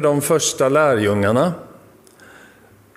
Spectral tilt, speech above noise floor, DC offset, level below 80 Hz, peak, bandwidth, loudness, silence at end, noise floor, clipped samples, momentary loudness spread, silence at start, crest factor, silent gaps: -4.5 dB/octave; 32 dB; under 0.1%; -60 dBFS; -2 dBFS; 16 kHz; -17 LUFS; 1.3 s; -49 dBFS; under 0.1%; 5 LU; 0 s; 16 dB; none